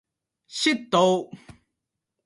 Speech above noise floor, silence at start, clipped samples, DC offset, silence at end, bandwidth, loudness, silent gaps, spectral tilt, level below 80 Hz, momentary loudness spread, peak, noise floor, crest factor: 60 dB; 0.5 s; under 0.1%; under 0.1%; 0.9 s; 11.5 kHz; -22 LUFS; none; -4 dB/octave; -66 dBFS; 16 LU; -6 dBFS; -83 dBFS; 20 dB